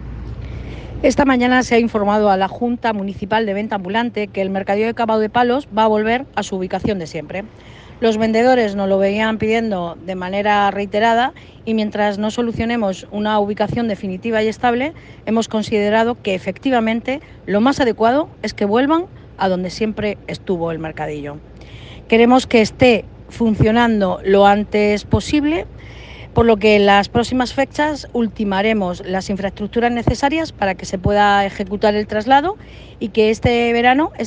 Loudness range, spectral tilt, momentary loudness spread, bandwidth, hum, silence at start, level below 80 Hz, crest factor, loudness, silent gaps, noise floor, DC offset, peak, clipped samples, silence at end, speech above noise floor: 4 LU; -6 dB/octave; 12 LU; 9.6 kHz; none; 0 s; -40 dBFS; 16 dB; -17 LUFS; none; -36 dBFS; under 0.1%; 0 dBFS; under 0.1%; 0 s; 19 dB